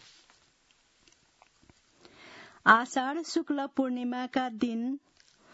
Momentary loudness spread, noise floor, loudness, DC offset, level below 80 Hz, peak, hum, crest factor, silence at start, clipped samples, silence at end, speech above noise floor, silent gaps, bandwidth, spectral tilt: 20 LU; -67 dBFS; -29 LUFS; under 0.1%; -74 dBFS; -6 dBFS; none; 26 dB; 2.25 s; under 0.1%; 0.55 s; 39 dB; none; 7.6 kHz; -2 dB/octave